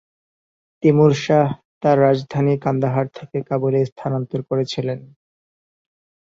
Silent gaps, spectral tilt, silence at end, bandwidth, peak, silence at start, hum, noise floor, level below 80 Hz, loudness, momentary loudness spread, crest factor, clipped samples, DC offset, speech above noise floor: 1.65-1.81 s, 3.92-3.96 s; -7.5 dB/octave; 1.3 s; 7.6 kHz; -4 dBFS; 0.8 s; none; under -90 dBFS; -58 dBFS; -19 LUFS; 10 LU; 16 dB; under 0.1%; under 0.1%; over 72 dB